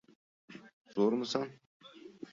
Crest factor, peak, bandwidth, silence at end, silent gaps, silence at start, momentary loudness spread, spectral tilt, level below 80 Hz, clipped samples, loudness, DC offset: 20 dB; -16 dBFS; 7.6 kHz; 0.05 s; 0.73-0.85 s, 1.66-1.80 s; 0.5 s; 23 LU; -5.5 dB/octave; -82 dBFS; under 0.1%; -34 LUFS; under 0.1%